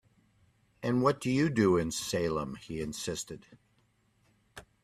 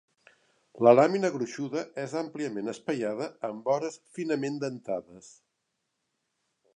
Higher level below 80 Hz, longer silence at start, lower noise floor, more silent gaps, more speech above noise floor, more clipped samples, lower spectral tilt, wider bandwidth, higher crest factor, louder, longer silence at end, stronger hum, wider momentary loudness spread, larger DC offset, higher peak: first, -60 dBFS vs -80 dBFS; about the same, 0.8 s vs 0.75 s; second, -71 dBFS vs -81 dBFS; neither; second, 40 dB vs 53 dB; neither; about the same, -5.5 dB/octave vs -6 dB/octave; first, 15 kHz vs 10.5 kHz; about the same, 20 dB vs 24 dB; about the same, -31 LUFS vs -29 LUFS; second, 0.25 s vs 1.45 s; neither; about the same, 12 LU vs 14 LU; neither; second, -14 dBFS vs -6 dBFS